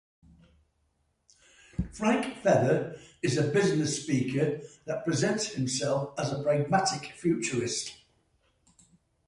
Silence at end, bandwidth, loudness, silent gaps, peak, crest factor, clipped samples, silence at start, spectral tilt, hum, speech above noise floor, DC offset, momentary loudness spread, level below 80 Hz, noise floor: 1.35 s; 11.5 kHz; -29 LUFS; none; -10 dBFS; 20 dB; under 0.1%; 1.8 s; -5 dB/octave; none; 45 dB; under 0.1%; 10 LU; -54 dBFS; -74 dBFS